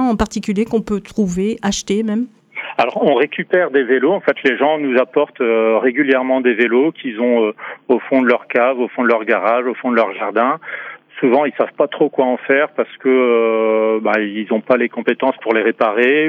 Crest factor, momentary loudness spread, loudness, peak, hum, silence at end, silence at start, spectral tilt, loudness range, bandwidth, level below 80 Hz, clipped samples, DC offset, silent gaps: 14 dB; 5 LU; -16 LUFS; -2 dBFS; none; 0 s; 0 s; -5.5 dB/octave; 2 LU; 11 kHz; -48 dBFS; under 0.1%; under 0.1%; none